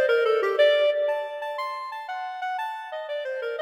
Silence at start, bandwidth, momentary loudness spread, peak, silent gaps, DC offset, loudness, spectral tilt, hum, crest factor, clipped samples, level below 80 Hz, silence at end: 0 s; 14 kHz; 13 LU; -10 dBFS; none; under 0.1%; -26 LUFS; -1 dB/octave; 50 Hz at -80 dBFS; 14 dB; under 0.1%; -80 dBFS; 0 s